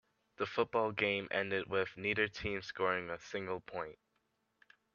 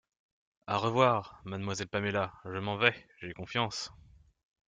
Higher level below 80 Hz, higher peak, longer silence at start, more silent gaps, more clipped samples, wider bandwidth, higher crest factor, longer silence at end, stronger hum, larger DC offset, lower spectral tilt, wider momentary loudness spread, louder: about the same, -68 dBFS vs -66 dBFS; second, -16 dBFS vs -8 dBFS; second, 0.4 s vs 0.65 s; neither; neither; second, 7.2 kHz vs 9.4 kHz; about the same, 22 dB vs 26 dB; first, 1 s vs 0.75 s; neither; neither; about the same, -5 dB/octave vs -4.5 dB/octave; second, 9 LU vs 17 LU; second, -37 LUFS vs -32 LUFS